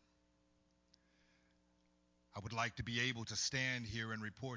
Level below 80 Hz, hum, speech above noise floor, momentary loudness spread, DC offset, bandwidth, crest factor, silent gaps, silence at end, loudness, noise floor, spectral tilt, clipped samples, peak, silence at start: -66 dBFS; 60 Hz at -70 dBFS; 35 dB; 9 LU; under 0.1%; 7.6 kHz; 22 dB; none; 0 s; -40 LUFS; -77 dBFS; -3 dB/octave; under 0.1%; -24 dBFS; 2.35 s